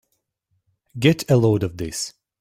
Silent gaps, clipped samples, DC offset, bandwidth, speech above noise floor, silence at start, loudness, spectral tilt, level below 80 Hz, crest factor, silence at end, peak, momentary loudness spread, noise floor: none; under 0.1%; under 0.1%; 16 kHz; 54 dB; 0.95 s; -20 LUFS; -6 dB/octave; -50 dBFS; 18 dB; 0.3 s; -4 dBFS; 13 LU; -73 dBFS